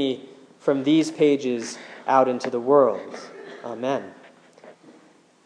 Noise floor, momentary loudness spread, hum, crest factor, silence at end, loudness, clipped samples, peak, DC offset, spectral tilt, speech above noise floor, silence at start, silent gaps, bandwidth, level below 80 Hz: -55 dBFS; 19 LU; none; 20 dB; 0.75 s; -22 LUFS; under 0.1%; -4 dBFS; under 0.1%; -5.5 dB/octave; 33 dB; 0 s; none; 10.5 kHz; -86 dBFS